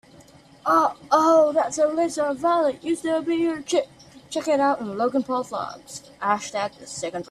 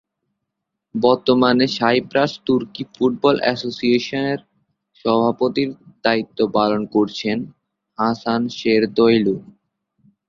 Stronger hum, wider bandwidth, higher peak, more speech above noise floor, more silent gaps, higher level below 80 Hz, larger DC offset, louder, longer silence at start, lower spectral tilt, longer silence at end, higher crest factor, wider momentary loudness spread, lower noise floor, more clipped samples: neither; first, 13.5 kHz vs 7.4 kHz; second, -6 dBFS vs 0 dBFS; second, 28 dB vs 61 dB; neither; second, -66 dBFS vs -58 dBFS; neither; second, -23 LUFS vs -19 LUFS; second, 0.65 s vs 0.95 s; second, -4 dB/octave vs -6 dB/octave; second, 0.1 s vs 0.85 s; about the same, 16 dB vs 20 dB; about the same, 12 LU vs 10 LU; second, -50 dBFS vs -79 dBFS; neither